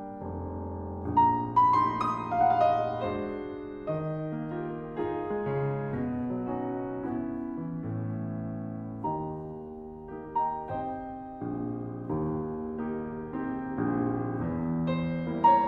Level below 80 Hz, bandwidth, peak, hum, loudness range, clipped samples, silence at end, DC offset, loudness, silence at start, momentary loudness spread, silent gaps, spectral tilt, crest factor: -54 dBFS; 6.8 kHz; -12 dBFS; none; 8 LU; under 0.1%; 0 s; under 0.1%; -31 LUFS; 0 s; 13 LU; none; -9.5 dB/octave; 18 dB